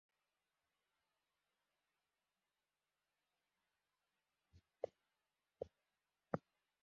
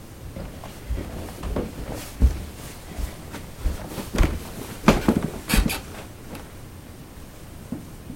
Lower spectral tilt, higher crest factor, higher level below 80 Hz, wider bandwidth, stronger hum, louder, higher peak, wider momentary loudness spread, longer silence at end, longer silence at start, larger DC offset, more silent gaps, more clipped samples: first, -7.5 dB/octave vs -5.5 dB/octave; first, 38 dB vs 26 dB; second, -84 dBFS vs -30 dBFS; second, 5.4 kHz vs 17 kHz; first, 50 Hz at -105 dBFS vs none; second, -52 LUFS vs -27 LUFS; second, -22 dBFS vs 0 dBFS; second, 7 LU vs 19 LU; first, 0.45 s vs 0 s; first, 4.55 s vs 0 s; neither; neither; neither